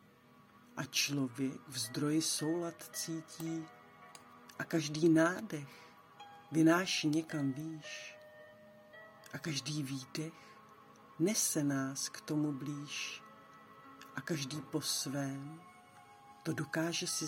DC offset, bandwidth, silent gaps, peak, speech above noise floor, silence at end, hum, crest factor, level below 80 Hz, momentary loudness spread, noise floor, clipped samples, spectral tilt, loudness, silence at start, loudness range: under 0.1%; 16.5 kHz; none; -16 dBFS; 27 dB; 0 s; none; 20 dB; -82 dBFS; 24 LU; -63 dBFS; under 0.1%; -4 dB/octave; -36 LUFS; 0.55 s; 8 LU